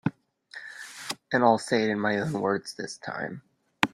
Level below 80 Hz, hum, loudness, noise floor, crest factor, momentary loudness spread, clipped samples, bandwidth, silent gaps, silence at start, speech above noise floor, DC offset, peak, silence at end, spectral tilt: -68 dBFS; none; -27 LUFS; -48 dBFS; 26 dB; 19 LU; under 0.1%; 16 kHz; none; 0.05 s; 22 dB; under 0.1%; -2 dBFS; 0.05 s; -5 dB/octave